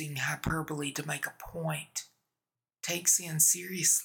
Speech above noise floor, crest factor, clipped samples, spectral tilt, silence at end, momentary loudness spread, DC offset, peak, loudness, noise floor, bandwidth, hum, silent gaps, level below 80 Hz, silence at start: over 59 dB; 22 dB; under 0.1%; -2 dB/octave; 0 s; 14 LU; under 0.1%; -10 dBFS; -29 LUFS; under -90 dBFS; 19.5 kHz; none; none; -58 dBFS; 0 s